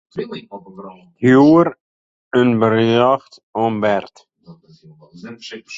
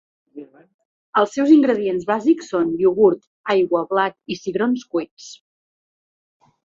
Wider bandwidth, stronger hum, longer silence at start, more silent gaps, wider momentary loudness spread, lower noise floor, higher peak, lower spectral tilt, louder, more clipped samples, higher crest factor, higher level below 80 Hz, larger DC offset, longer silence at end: about the same, 7.6 kHz vs 7.6 kHz; neither; second, 0.15 s vs 0.35 s; about the same, 1.80-2.31 s, 3.43-3.53 s vs 0.74-0.79 s, 0.85-1.13 s, 3.27-3.44 s, 5.11-5.17 s; first, 24 LU vs 13 LU; about the same, under -90 dBFS vs under -90 dBFS; about the same, -2 dBFS vs -2 dBFS; first, -7.5 dB/octave vs -6 dB/octave; first, -15 LUFS vs -19 LUFS; neither; about the same, 16 dB vs 18 dB; first, -58 dBFS vs -64 dBFS; neither; second, 0 s vs 1.3 s